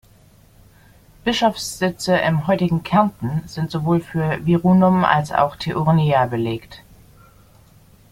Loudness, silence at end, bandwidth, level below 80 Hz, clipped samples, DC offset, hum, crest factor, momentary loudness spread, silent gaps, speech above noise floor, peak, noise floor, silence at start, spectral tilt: -19 LUFS; 1.35 s; 15.5 kHz; -48 dBFS; under 0.1%; under 0.1%; none; 18 dB; 10 LU; none; 32 dB; -2 dBFS; -50 dBFS; 1.25 s; -6.5 dB/octave